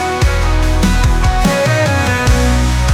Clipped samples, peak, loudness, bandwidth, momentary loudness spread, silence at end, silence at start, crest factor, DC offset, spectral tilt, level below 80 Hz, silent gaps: under 0.1%; -2 dBFS; -13 LUFS; 15.5 kHz; 2 LU; 0 s; 0 s; 10 dB; under 0.1%; -5 dB/octave; -14 dBFS; none